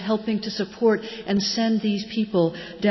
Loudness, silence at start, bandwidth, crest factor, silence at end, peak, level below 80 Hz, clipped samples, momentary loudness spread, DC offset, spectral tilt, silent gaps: -24 LUFS; 0 s; 6.2 kHz; 16 dB; 0 s; -8 dBFS; -58 dBFS; under 0.1%; 5 LU; under 0.1%; -5.5 dB/octave; none